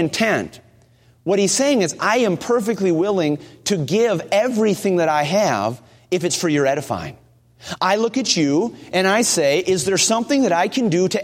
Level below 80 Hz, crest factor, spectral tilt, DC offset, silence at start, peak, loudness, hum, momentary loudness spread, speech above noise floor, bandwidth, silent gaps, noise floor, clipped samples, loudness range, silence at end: -58 dBFS; 16 dB; -4 dB/octave; under 0.1%; 0 s; -4 dBFS; -18 LUFS; none; 8 LU; 35 dB; 16.5 kHz; none; -53 dBFS; under 0.1%; 3 LU; 0 s